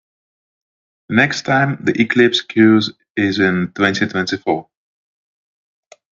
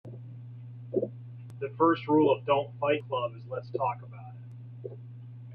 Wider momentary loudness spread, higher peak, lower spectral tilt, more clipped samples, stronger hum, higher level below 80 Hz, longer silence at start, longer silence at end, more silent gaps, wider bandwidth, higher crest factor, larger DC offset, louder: second, 8 LU vs 21 LU; first, 0 dBFS vs -12 dBFS; second, -5.5 dB/octave vs -9.5 dB/octave; neither; neither; first, -60 dBFS vs -72 dBFS; first, 1.1 s vs 0.05 s; first, 1.5 s vs 0 s; first, 3.10-3.15 s vs none; first, 7.6 kHz vs 5.2 kHz; about the same, 18 dB vs 20 dB; neither; first, -16 LUFS vs -29 LUFS